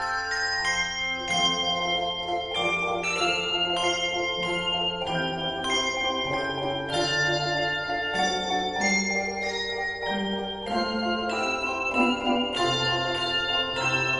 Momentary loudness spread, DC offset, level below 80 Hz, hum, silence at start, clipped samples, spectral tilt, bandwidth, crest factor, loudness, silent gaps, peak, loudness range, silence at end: 5 LU; under 0.1%; -52 dBFS; none; 0 s; under 0.1%; -3 dB/octave; 11.5 kHz; 16 dB; -25 LUFS; none; -12 dBFS; 2 LU; 0 s